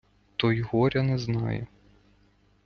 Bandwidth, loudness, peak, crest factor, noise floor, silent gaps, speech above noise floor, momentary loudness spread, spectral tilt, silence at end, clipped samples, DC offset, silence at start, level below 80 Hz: 6.6 kHz; -27 LUFS; -8 dBFS; 20 dB; -63 dBFS; none; 37 dB; 11 LU; -7.5 dB/octave; 1 s; under 0.1%; under 0.1%; 0.4 s; -54 dBFS